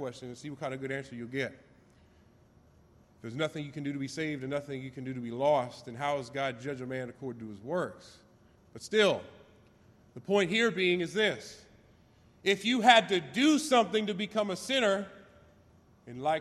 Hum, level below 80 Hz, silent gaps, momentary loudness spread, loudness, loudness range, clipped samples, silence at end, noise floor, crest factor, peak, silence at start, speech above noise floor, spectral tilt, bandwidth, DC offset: none; -70 dBFS; none; 16 LU; -30 LUFS; 12 LU; under 0.1%; 0 s; -61 dBFS; 26 dB; -6 dBFS; 0 s; 31 dB; -4 dB/octave; 13.5 kHz; under 0.1%